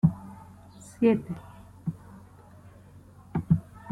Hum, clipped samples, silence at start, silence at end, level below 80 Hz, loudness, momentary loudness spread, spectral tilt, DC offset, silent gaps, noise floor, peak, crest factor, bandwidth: none; under 0.1%; 0.05 s; 0 s; -54 dBFS; -29 LUFS; 25 LU; -9 dB/octave; under 0.1%; none; -51 dBFS; -8 dBFS; 22 dB; 11.5 kHz